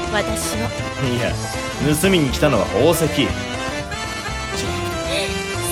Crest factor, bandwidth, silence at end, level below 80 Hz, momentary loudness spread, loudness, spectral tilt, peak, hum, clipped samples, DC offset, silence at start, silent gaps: 18 dB; 17.5 kHz; 0 s; -34 dBFS; 9 LU; -20 LUFS; -4.5 dB/octave; -2 dBFS; none; under 0.1%; under 0.1%; 0 s; none